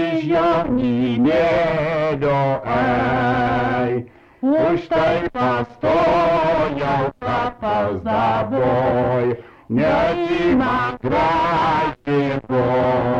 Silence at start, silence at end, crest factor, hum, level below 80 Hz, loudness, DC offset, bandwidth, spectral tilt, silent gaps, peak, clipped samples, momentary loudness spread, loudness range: 0 s; 0 s; 10 dB; none; -42 dBFS; -19 LUFS; under 0.1%; 8 kHz; -8 dB/octave; none; -8 dBFS; under 0.1%; 4 LU; 1 LU